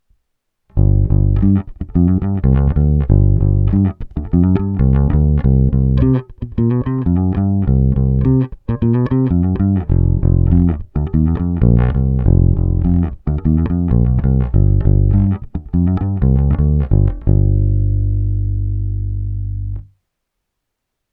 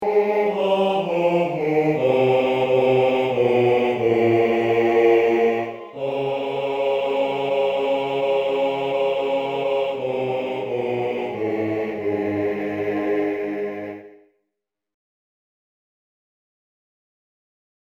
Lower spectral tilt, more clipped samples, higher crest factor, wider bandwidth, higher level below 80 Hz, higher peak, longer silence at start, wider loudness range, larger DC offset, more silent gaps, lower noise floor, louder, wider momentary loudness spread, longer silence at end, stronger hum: first, -13.5 dB/octave vs -7 dB/octave; neither; about the same, 14 dB vs 16 dB; second, 3.3 kHz vs 8.6 kHz; first, -20 dBFS vs -62 dBFS; first, 0 dBFS vs -6 dBFS; first, 0.75 s vs 0 s; second, 2 LU vs 9 LU; neither; neither; second, -76 dBFS vs -81 dBFS; first, -15 LUFS vs -21 LUFS; about the same, 7 LU vs 8 LU; second, 1.3 s vs 3.85 s; neither